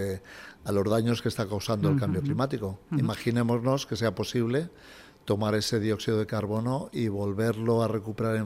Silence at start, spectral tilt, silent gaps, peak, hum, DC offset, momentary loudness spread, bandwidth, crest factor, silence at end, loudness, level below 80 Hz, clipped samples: 0 s; -6.5 dB/octave; none; -12 dBFS; none; under 0.1%; 6 LU; 16 kHz; 14 dB; 0 s; -28 LUFS; -58 dBFS; under 0.1%